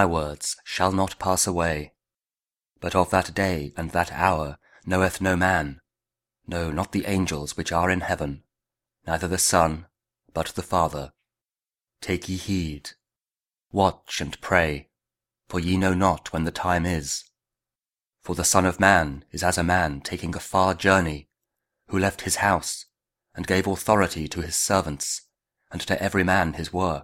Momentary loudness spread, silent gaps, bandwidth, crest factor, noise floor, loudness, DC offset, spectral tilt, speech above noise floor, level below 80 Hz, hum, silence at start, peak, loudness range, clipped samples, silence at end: 13 LU; none; 16.5 kHz; 24 dB; under -90 dBFS; -24 LUFS; under 0.1%; -4 dB/octave; over 66 dB; -44 dBFS; none; 0 s; -2 dBFS; 5 LU; under 0.1%; 0 s